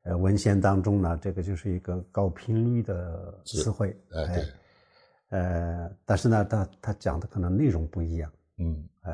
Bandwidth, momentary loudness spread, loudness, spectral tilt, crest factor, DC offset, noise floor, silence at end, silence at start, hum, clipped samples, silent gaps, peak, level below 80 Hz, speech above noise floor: 10.5 kHz; 11 LU; -28 LUFS; -7.5 dB/octave; 18 dB; under 0.1%; -63 dBFS; 0 s; 0.05 s; none; under 0.1%; none; -10 dBFS; -42 dBFS; 36 dB